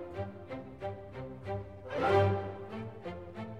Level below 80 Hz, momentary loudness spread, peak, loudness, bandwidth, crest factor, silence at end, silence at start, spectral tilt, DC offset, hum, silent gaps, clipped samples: -60 dBFS; 16 LU; -16 dBFS; -36 LUFS; 8.8 kHz; 20 dB; 0 s; 0 s; -8 dB/octave; 0.1%; none; none; under 0.1%